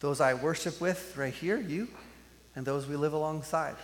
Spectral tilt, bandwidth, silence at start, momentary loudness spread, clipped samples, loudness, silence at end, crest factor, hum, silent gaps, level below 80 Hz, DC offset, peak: -5 dB/octave; 17.5 kHz; 0 s; 11 LU; under 0.1%; -32 LUFS; 0 s; 20 dB; none; none; -62 dBFS; under 0.1%; -14 dBFS